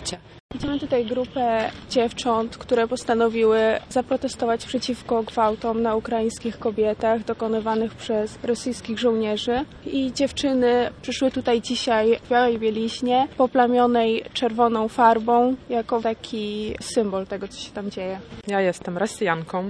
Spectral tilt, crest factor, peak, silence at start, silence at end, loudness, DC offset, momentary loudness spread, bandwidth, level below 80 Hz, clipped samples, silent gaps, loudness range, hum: -4.5 dB/octave; 20 dB; -2 dBFS; 0 s; 0 s; -23 LUFS; under 0.1%; 10 LU; 11 kHz; -50 dBFS; under 0.1%; 0.40-0.49 s; 5 LU; none